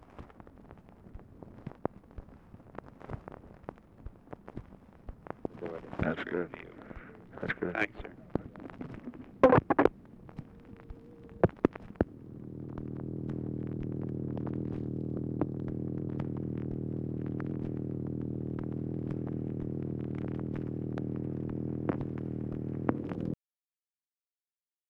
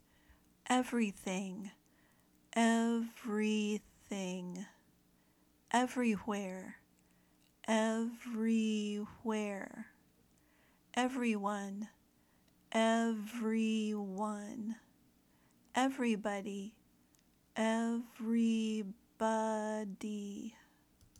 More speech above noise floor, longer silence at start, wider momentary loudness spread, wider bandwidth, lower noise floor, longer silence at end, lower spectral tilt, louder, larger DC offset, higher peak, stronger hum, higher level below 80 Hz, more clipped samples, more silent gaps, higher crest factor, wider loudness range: first, over 55 dB vs 35 dB; second, 0 s vs 0.65 s; first, 20 LU vs 15 LU; second, 6.6 kHz vs 13 kHz; first, under -90 dBFS vs -71 dBFS; first, 1.55 s vs 0.7 s; first, -9.5 dB/octave vs -5 dB/octave; about the same, -35 LUFS vs -37 LUFS; neither; first, -10 dBFS vs -18 dBFS; neither; first, -54 dBFS vs -76 dBFS; neither; neither; first, 26 dB vs 20 dB; first, 16 LU vs 3 LU